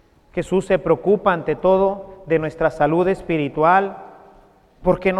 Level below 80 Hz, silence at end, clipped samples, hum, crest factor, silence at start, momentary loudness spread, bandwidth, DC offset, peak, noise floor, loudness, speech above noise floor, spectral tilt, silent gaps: -44 dBFS; 0 s; under 0.1%; none; 18 dB; 0.35 s; 11 LU; 10.5 kHz; under 0.1%; -2 dBFS; -51 dBFS; -19 LUFS; 33 dB; -7.5 dB/octave; none